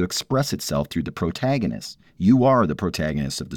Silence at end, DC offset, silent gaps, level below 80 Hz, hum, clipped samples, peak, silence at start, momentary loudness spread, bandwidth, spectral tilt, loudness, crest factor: 0 s; under 0.1%; none; -44 dBFS; none; under 0.1%; -6 dBFS; 0 s; 11 LU; 18.5 kHz; -5.5 dB/octave; -22 LUFS; 16 dB